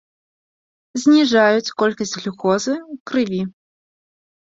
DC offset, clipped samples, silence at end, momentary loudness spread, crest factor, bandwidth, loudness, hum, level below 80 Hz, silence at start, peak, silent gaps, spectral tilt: under 0.1%; under 0.1%; 1.1 s; 12 LU; 18 dB; 7.8 kHz; -18 LUFS; none; -64 dBFS; 0.95 s; -2 dBFS; 3.00-3.06 s; -4.5 dB/octave